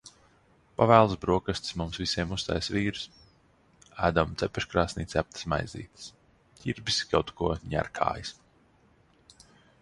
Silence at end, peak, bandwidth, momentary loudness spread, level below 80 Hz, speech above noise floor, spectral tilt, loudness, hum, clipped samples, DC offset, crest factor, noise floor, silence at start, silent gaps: 1.5 s; -4 dBFS; 11.5 kHz; 18 LU; -48 dBFS; 35 dB; -5 dB/octave; -28 LUFS; none; under 0.1%; under 0.1%; 26 dB; -63 dBFS; 0.05 s; none